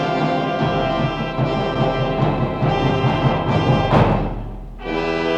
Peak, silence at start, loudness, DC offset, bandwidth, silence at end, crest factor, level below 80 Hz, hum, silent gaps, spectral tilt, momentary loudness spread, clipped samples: -2 dBFS; 0 s; -19 LUFS; under 0.1%; 8 kHz; 0 s; 16 dB; -32 dBFS; none; none; -7.5 dB/octave; 8 LU; under 0.1%